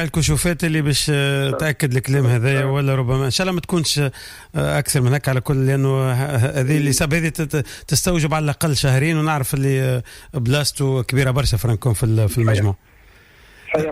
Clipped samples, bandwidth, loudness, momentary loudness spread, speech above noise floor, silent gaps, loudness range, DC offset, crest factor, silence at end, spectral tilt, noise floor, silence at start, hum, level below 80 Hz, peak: under 0.1%; 15.5 kHz; -19 LUFS; 5 LU; 30 dB; none; 1 LU; under 0.1%; 12 dB; 0 s; -5 dB/octave; -48 dBFS; 0 s; none; -36 dBFS; -6 dBFS